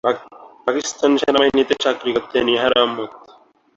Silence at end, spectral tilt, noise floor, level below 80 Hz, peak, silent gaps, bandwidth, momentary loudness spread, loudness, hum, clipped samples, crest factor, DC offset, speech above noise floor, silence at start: 0.6 s; -3 dB/octave; -50 dBFS; -54 dBFS; -2 dBFS; none; 8 kHz; 11 LU; -18 LUFS; none; under 0.1%; 18 dB; under 0.1%; 33 dB; 0.05 s